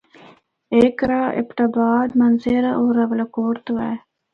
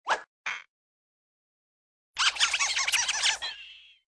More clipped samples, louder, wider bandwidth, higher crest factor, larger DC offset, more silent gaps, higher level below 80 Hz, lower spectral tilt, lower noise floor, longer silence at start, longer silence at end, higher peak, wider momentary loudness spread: neither; first, -19 LUFS vs -26 LUFS; second, 5.2 kHz vs 11 kHz; second, 16 dB vs 22 dB; neither; second, none vs 0.27-0.44 s, 0.68-2.14 s; first, -52 dBFS vs -68 dBFS; first, -8 dB/octave vs 3.5 dB/octave; about the same, -49 dBFS vs -50 dBFS; first, 0.7 s vs 0.05 s; about the same, 0.35 s vs 0.3 s; first, -2 dBFS vs -10 dBFS; second, 7 LU vs 17 LU